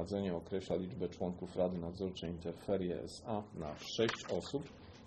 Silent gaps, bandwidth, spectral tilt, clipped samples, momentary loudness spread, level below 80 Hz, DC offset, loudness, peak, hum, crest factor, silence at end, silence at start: none; 9.4 kHz; -6 dB/octave; under 0.1%; 8 LU; -62 dBFS; under 0.1%; -40 LUFS; -20 dBFS; none; 20 dB; 0 s; 0 s